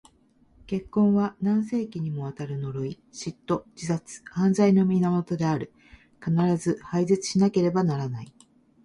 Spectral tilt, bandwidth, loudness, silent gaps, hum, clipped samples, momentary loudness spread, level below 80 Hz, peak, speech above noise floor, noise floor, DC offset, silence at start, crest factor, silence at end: -7 dB/octave; 11.5 kHz; -25 LUFS; none; none; under 0.1%; 13 LU; -60 dBFS; -8 dBFS; 36 dB; -61 dBFS; under 0.1%; 0.7 s; 16 dB; 0.55 s